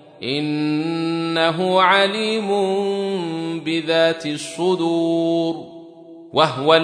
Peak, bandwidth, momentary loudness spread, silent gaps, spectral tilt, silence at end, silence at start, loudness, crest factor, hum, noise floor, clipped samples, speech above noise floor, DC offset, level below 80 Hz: -2 dBFS; 10.5 kHz; 10 LU; none; -5 dB/octave; 0 s; 0.2 s; -19 LUFS; 18 dB; none; -41 dBFS; under 0.1%; 22 dB; under 0.1%; -70 dBFS